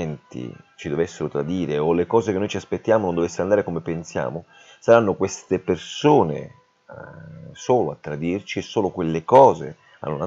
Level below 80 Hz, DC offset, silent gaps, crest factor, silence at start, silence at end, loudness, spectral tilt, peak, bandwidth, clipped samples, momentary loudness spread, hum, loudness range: -56 dBFS; under 0.1%; none; 22 dB; 0 s; 0 s; -21 LUFS; -6 dB/octave; 0 dBFS; 8 kHz; under 0.1%; 19 LU; none; 2 LU